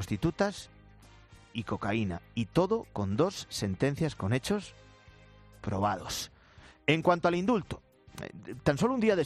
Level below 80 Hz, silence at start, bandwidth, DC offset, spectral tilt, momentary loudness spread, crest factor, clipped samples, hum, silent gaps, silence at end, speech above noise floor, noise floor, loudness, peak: -56 dBFS; 0 s; 14 kHz; under 0.1%; -6 dB/octave; 17 LU; 20 dB; under 0.1%; none; none; 0 s; 26 dB; -56 dBFS; -31 LUFS; -10 dBFS